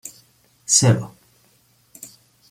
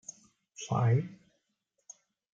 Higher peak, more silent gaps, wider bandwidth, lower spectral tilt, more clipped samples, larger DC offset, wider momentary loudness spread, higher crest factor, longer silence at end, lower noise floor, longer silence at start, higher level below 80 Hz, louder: first, -2 dBFS vs -18 dBFS; neither; first, 16 kHz vs 7.6 kHz; second, -3.5 dB/octave vs -6.5 dB/octave; neither; neither; about the same, 26 LU vs 25 LU; about the same, 22 dB vs 18 dB; second, 0.45 s vs 1.2 s; second, -59 dBFS vs -81 dBFS; second, 0.05 s vs 0.6 s; first, -56 dBFS vs -72 dBFS; first, -17 LUFS vs -30 LUFS